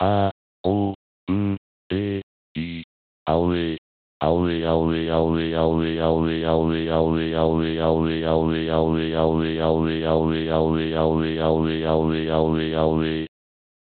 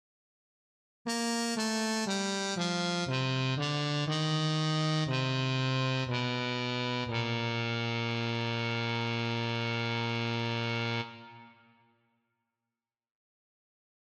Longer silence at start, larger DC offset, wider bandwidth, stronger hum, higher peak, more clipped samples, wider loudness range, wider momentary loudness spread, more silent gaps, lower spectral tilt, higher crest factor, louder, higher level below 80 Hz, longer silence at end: second, 0 s vs 1.05 s; neither; second, 4.5 kHz vs 13.5 kHz; neither; first, -6 dBFS vs -20 dBFS; neither; about the same, 5 LU vs 6 LU; first, 8 LU vs 3 LU; first, 0.31-0.64 s, 0.95-1.27 s, 1.58-1.90 s, 2.23-2.55 s, 2.84-3.26 s, 3.78-4.21 s vs none; first, -6 dB/octave vs -4.5 dB/octave; about the same, 16 dB vs 14 dB; first, -22 LUFS vs -31 LUFS; first, -40 dBFS vs -72 dBFS; second, 0.65 s vs 2.55 s